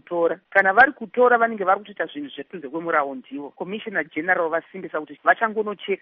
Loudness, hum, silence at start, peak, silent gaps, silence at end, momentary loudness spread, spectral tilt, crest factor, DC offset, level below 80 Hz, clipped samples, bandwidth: -21 LUFS; none; 0.1 s; -2 dBFS; none; 0.05 s; 16 LU; -2 dB/octave; 20 dB; under 0.1%; -70 dBFS; under 0.1%; 5.4 kHz